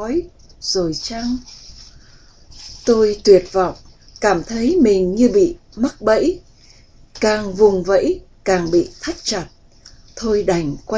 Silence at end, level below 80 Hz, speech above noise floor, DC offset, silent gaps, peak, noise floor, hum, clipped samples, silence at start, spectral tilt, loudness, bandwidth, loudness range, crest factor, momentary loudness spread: 0 s; -42 dBFS; 30 dB; under 0.1%; none; 0 dBFS; -46 dBFS; none; under 0.1%; 0 s; -5 dB/octave; -17 LUFS; 8 kHz; 3 LU; 18 dB; 13 LU